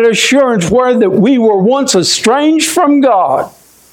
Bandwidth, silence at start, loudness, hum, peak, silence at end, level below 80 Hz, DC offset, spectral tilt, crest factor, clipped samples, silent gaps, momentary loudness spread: 17.5 kHz; 0 s; -9 LUFS; none; 0 dBFS; 0.45 s; -46 dBFS; under 0.1%; -4 dB/octave; 10 dB; under 0.1%; none; 2 LU